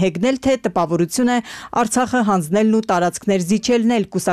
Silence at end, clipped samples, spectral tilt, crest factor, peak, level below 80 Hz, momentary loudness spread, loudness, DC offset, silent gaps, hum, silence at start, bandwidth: 0 s; under 0.1%; -5 dB/octave; 10 dB; -6 dBFS; -50 dBFS; 3 LU; -18 LUFS; under 0.1%; none; none; 0 s; 14.5 kHz